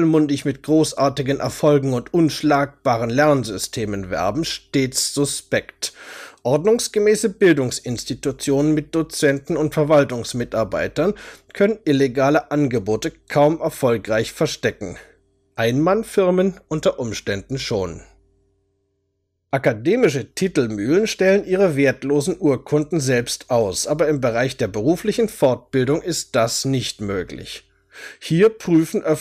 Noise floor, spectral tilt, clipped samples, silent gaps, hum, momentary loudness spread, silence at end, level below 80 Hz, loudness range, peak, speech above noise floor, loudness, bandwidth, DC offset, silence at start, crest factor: -72 dBFS; -5 dB/octave; under 0.1%; none; none; 9 LU; 0 s; -50 dBFS; 3 LU; -4 dBFS; 53 dB; -20 LUFS; 15.5 kHz; under 0.1%; 0 s; 16 dB